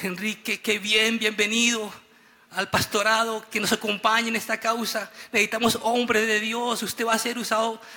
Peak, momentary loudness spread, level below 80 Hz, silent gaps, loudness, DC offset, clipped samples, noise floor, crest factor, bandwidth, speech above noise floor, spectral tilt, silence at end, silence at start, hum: -8 dBFS; 8 LU; -64 dBFS; none; -23 LUFS; under 0.1%; under 0.1%; -55 dBFS; 16 dB; 18 kHz; 31 dB; -2 dB/octave; 0 s; 0 s; none